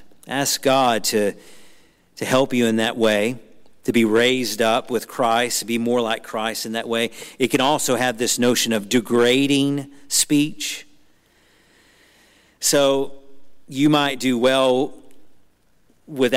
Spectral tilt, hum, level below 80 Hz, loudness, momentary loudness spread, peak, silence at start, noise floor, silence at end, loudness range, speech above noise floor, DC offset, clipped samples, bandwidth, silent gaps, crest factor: -3.5 dB/octave; none; -60 dBFS; -20 LUFS; 10 LU; -6 dBFS; 0 s; -61 dBFS; 0 s; 4 LU; 41 dB; under 0.1%; under 0.1%; 16 kHz; none; 16 dB